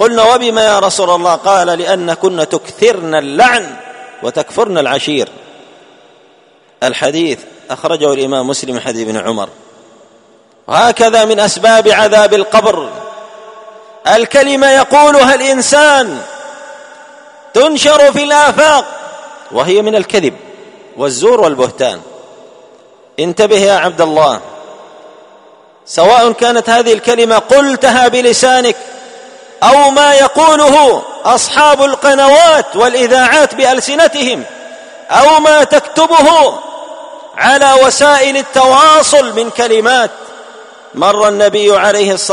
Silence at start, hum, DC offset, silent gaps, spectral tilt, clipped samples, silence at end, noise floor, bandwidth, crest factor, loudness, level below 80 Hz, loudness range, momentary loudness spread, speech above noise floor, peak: 0 s; none; under 0.1%; none; -2.5 dB/octave; 0.8%; 0 s; -46 dBFS; 11 kHz; 10 dB; -8 LUFS; -52 dBFS; 8 LU; 14 LU; 38 dB; 0 dBFS